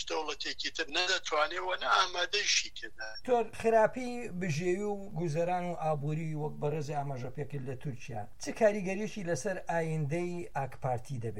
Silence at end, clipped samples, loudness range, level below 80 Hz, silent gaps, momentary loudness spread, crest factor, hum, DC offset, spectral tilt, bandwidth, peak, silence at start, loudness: 0 s; under 0.1%; 5 LU; -60 dBFS; none; 12 LU; 22 dB; none; 0.7%; -4 dB/octave; 13.5 kHz; -12 dBFS; 0 s; -33 LUFS